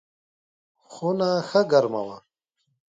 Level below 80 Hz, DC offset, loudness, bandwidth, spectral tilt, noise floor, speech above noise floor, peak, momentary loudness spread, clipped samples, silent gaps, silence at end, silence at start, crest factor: -74 dBFS; under 0.1%; -23 LUFS; 7.8 kHz; -6 dB/octave; -75 dBFS; 53 dB; -6 dBFS; 12 LU; under 0.1%; none; 0.7 s; 0.9 s; 20 dB